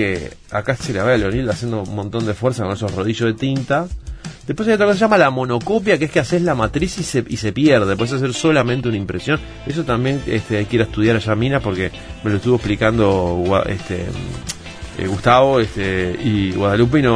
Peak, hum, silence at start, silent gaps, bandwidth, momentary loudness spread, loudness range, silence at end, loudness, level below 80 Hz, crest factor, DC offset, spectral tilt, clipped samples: 0 dBFS; none; 0 s; none; 11 kHz; 11 LU; 3 LU; 0 s; -18 LUFS; -36 dBFS; 18 dB; under 0.1%; -6 dB/octave; under 0.1%